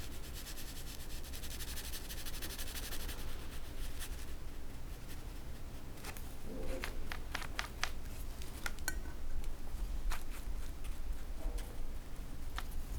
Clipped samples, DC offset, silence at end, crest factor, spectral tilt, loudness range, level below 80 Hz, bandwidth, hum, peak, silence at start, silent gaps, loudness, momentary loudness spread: under 0.1%; under 0.1%; 0 s; 26 dB; -3.5 dB/octave; 4 LU; -42 dBFS; over 20 kHz; none; -14 dBFS; 0 s; none; -46 LUFS; 7 LU